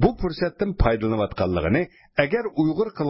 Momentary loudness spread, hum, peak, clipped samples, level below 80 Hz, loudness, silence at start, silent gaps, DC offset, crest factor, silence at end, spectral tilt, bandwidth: 4 LU; none; -4 dBFS; under 0.1%; -34 dBFS; -23 LUFS; 0 s; none; under 0.1%; 18 dB; 0 s; -11.5 dB/octave; 5.8 kHz